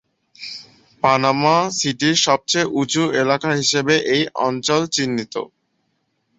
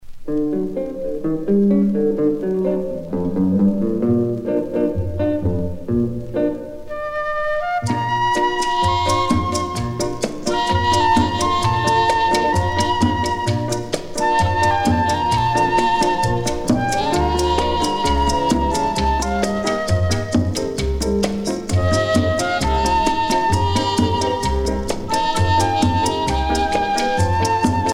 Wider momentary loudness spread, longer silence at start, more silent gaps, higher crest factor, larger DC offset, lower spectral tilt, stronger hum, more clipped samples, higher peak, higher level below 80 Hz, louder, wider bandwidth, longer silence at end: first, 16 LU vs 7 LU; first, 0.4 s vs 0 s; neither; about the same, 18 dB vs 16 dB; neither; second, -3.5 dB/octave vs -5 dB/octave; neither; neither; about the same, -2 dBFS vs -2 dBFS; second, -60 dBFS vs -32 dBFS; about the same, -18 LUFS vs -19 LUFS; second, 8.2 kHz vs 16.5 kHz; first, 0.9 s vs 0 s